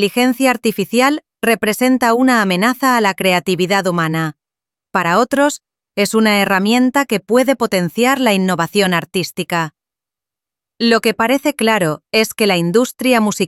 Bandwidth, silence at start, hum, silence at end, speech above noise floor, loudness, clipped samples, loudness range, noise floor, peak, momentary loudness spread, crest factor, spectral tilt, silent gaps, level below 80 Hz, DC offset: 16.5 kHz; 0 s; none; 0 s; 73 dB; -15 LUFS; under 0.1%; 3 LU; -88 dBFS; -2 dBFS; 6 LU; 14 dB; -4.5 dB/octave; none; -60 dBFS; under 0.1%